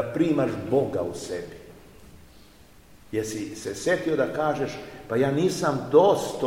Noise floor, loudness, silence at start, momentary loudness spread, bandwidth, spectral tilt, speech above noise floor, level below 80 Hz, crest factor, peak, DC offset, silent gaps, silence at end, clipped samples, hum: -52 dBFS; -25 LUFS; 0 s; 14 LU; 16.5 kHz; -5.5 dB/octave; 28 dB; -56 dBFS; 20 dB; -6 dBFS; 0.2%; none; 0 s; under 0.1%; none